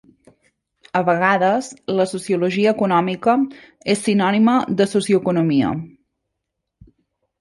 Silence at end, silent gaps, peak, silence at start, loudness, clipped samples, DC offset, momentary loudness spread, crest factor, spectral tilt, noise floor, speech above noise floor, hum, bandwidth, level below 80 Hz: 1.5 s; none; -2 dBFS; 0.95 s; -18 LUFS; under 0.1%; under 0.1%; 8 LU; 18 dB; -6 dB/octave; -79 dBFS; 61 dB; none; 11.5 kHz; -58 dBFS